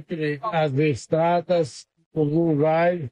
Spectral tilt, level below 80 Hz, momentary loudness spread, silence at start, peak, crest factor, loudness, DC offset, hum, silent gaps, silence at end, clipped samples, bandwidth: -7 dB/octave; -60 dBFS; 8 LU; 0 s; -8 dBFS; 14 dB; -22 LUFS; under 0.1%; none; 2.06-2.11 s; 0 s; under 0.1%; 10.5 kHz